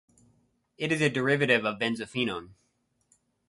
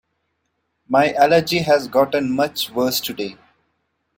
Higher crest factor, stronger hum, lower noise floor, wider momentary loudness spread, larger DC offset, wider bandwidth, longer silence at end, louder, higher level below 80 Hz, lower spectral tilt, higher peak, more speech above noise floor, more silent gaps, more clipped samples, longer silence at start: about the same, 22 dB vs 18 dB; neither; about the same, -70 dBFS vs -72 dBFS; about the same, 9 LU vs 9 LU; neither; second, 11.5 kHz vs 16.5 kHz; about the same, 0.95 s vs 0.85 s; second, -27 LUFS vs -18 LUFS; second, -66 dBFS vs -58 dBFS; about the same, -5 dB/octave vs -4.5 dB/octave; second, -8 dBFS vs -2 dBFS; second, 43 dB vs 54 dB; neither; neither; about the same, 0.8 s vs 0.9 s